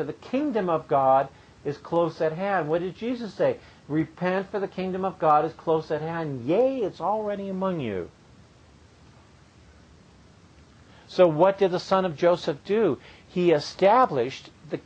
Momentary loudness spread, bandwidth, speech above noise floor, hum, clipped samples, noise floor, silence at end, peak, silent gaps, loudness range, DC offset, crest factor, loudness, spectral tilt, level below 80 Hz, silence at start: 12 LU; 8.6 kHz; 29 dB; none; under 0.1%; -54 dBFS; 0.05 s; -6 dBFS; none; 9 LU; under 0.1%; 20 dB; -25 LUFS; -7 dB/octave; -60 dBFS; 0 s